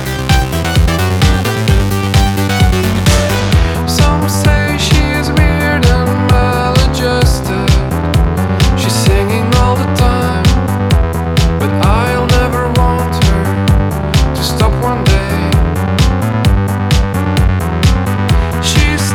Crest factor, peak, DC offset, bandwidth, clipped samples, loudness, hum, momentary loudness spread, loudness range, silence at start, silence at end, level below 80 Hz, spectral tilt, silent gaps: 10 dB; 0 dBFS; under 0.1%; 19 kHz; under 0.1%; -12 LUFS; none; 2 LU; 1 LU; 0 s; 0 s; -16 dBFS; -5.5 dB/octave; none